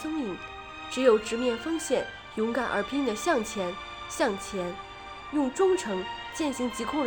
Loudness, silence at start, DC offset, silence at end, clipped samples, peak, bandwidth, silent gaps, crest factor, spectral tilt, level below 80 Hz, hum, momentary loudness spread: -29 LUFS; 0 s; under 0.1%; 0 s; under 0.1%; -10 dBFS; over 20 kHz; none; 18 dB; -4 dB/octave; -56 dBFS; none; 12 LU